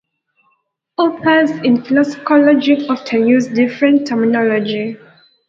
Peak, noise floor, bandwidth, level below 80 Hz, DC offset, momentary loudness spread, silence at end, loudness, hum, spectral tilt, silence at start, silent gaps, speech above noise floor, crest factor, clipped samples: 0 dBFS; -64 dBFS; 7.6 kHz; -62 dBFS; under 0.1%; 8 LU; 0.55 s; -14 LUFS; none; -6 dB/octave; 1 s; none; 50 dB; 14 dB; under 0.1%